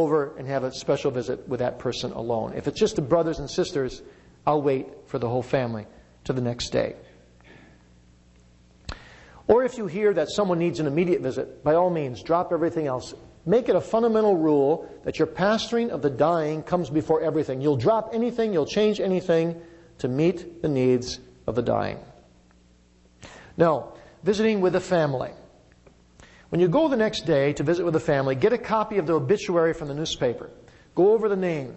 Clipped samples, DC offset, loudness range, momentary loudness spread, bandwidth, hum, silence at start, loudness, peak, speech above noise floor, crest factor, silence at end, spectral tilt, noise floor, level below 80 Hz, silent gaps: under 0.1%; under 0.1%; 5 LU; 11 LU; 8.4 kHz; none; 0 s; -24 LUFS; -6 dBFS; 33 dB; 18 dB; 0 s; -6.5 dB/octave; -57 dBFS; -52 dBFS; none